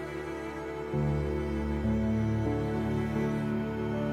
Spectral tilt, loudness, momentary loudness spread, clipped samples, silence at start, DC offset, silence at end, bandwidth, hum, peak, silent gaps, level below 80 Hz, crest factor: -8.5 dB/octave; -31 LUFS; 8 LU; under 0.1%; 0 s; under 0.1%; 0 s; 13 kHz; none; -18 dBFS; none; -42 dBFS; 12 dB